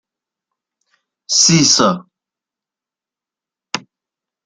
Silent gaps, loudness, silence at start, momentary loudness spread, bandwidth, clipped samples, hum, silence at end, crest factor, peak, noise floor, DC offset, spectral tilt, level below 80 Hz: none; -11 LUFS; 1.3 s; 17 LU; 11 kHz; under 0.1%; none; 0.65 s; 18 dB; 0 dBFS; -88 dBFS; under 0.1%; -2.5 dB/octave; -58 dBFS